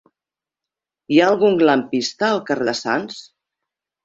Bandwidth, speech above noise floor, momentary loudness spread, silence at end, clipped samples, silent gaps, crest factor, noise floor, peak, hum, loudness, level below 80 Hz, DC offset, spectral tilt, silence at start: 7.8 kHz; 71 dB; 9 LU; 0.8 s; under 0.1%; none; 18 dB; -89 dBFS; -2 dBFS; none; -18 LUFS; -64 dBFS; under 0.1%; -4.5 dB/octave; 1.1 s